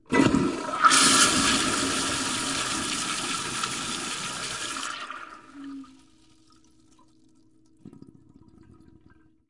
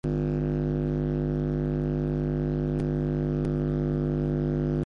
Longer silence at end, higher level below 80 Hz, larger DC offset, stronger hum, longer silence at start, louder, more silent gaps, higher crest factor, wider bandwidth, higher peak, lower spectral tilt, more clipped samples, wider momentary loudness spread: first, 1.6 s vs 0 s; second, -54 dBFS vs -36 dBFS; neither; second, none vs 50 Hz at -35 dBFS; about the same, 0.1 s vs 0.05 s; first, -23 LUFS vs -28 LUFS; neither; first, 26 dB vs 10 dB; first, 11.5 kHz vs 5.4 kHz; first, -2 dBFS vs -16 dBFS; second, -2 dB/octave vs -10.5 dB/octave; neither; first, 23 LU vs 1 LU